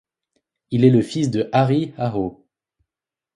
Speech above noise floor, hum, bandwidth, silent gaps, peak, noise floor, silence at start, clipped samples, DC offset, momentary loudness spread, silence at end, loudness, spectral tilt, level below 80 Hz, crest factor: 69 dB; none; 11.5 kHz; none; -2 dBFS; -87 dBFS; 0.7 s; under 0.1%; under 0.1%; 11 LU; 1.05 s; -19 LUFS; -7.5 dB/octave; -56 dBFS; 20 dB